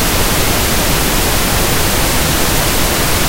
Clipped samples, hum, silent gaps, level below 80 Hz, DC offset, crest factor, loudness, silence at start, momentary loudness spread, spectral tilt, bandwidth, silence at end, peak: under 0.1%; none; none; -20 dBFS; under 0.1%; 12 dB; -12 LUFS; 0 s; 0 LU; -3 dB/octave; 16 kHz; 0 s; 0 dBFS